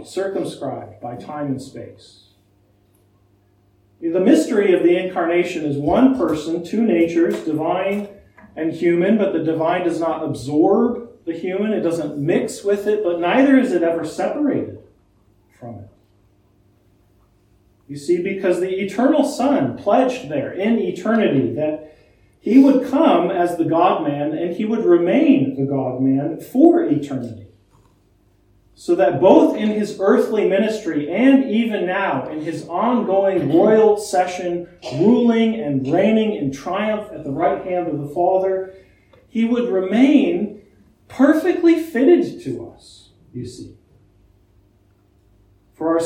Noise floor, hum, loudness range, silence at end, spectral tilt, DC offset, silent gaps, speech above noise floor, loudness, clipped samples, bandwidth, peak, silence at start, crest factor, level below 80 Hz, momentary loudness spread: -57 dBFS; none; 7 LU; 0 s; -6.5 dB/octave; under 0.1%; none; 40 dB; -18 LUFS; under 0.1%; 14.5 kHz; 0 dBFS; 0 s; 18 dB; -56 dBFS; 15 LU